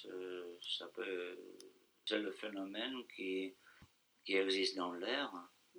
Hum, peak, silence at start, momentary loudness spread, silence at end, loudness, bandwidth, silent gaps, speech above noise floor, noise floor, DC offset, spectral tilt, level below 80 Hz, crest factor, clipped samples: none; -22 dBFS; 0 s; 17 LU; 0 s; -41 LUFS; over 20 kHz; none; 27 dB; -68 dBFS; under 0.1%; -3 dB/octave; -88 dBFS; 20 dB; under 0.1%